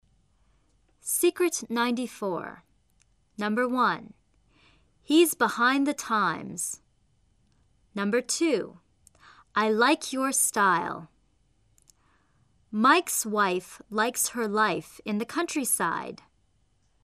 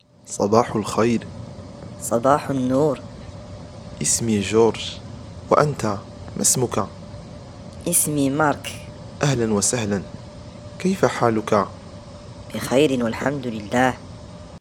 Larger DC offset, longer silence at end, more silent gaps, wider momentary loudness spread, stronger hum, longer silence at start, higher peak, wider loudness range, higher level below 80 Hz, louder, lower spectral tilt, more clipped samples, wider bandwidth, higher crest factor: neither; first, 0.9 s vs 0 s; neither; second, 13 LU vs 20 LU; neither; first, 1.05 s vs 0.25 s; second, -8 dBFS vs 0 dBFS; about the same, 4 LU vs 2 LU; second, -68 dBFS vs -48 dBFS; second, -26 LUFS vs -21 LUFS; second, -3 dB/octave vs -4.5 dB/octave; neither; second, 14 kHz vs 20 kHz; about the same, 20 dB vs 22 dB